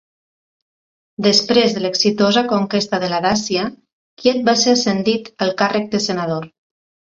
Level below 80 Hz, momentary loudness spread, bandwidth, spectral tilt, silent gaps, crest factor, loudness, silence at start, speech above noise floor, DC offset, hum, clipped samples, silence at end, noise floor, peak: -56 dBFS; 8 LU; 7.8 kHz; -4 dB/octave; 3.92-4.17 s; 18 dB; -17 LUFS; 1.2 s; over 73 dB; under 0.1%; none; under 0.1%; 0.65 s; under -90 dBFS; 0 dBFS